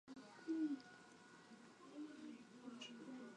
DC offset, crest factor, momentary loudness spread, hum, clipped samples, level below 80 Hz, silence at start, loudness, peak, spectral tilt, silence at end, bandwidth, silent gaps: under 0.1%; 18 dB; 18 LU; none; under 0.1%; under -90 dBFS; 0.05 s; -51 LUFS; -34 dBFS; -4.5 dB/octave; 0 s; 10.5 kHz; none